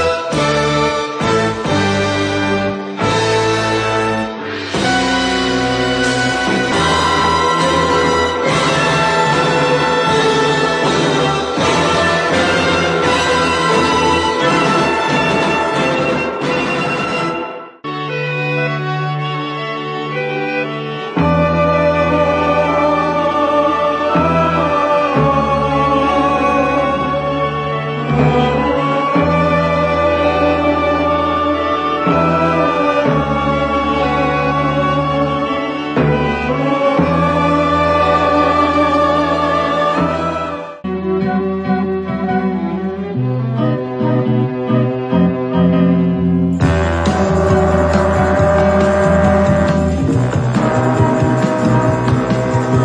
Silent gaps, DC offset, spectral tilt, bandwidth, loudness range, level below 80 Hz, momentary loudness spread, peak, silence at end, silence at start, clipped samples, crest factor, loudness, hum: none; under 0.1%; -5.5 dB/octave; 10.5 kHz; 4 LU; -34 dBFS; 6 LU; 0 dBFS; 0 s; 0 s; under 0.1%; 14 dB; -14 LUFS; none